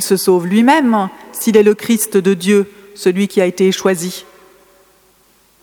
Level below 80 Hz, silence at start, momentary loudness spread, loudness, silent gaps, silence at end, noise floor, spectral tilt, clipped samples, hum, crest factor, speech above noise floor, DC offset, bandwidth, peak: -62 dBFS; 0 s; 9 LU; -14 LUFS; none; 1.4 s; -53 dBFS; -5 dB/octave; under 0.1%; none; 14 dB; 39 dB; under 0.1%; 20 kHz; 0 dBFS